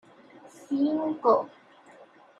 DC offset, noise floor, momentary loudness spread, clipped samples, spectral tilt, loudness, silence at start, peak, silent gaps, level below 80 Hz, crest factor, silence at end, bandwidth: under 0.1%; -54 dBFS; 9 LU; under 0.1%; -7 dB/octave; -26 LUFS; 0.6 s; -8 dBFS; none; -82 dBFS; 20 dB; 0.9 s; 10.5 kHz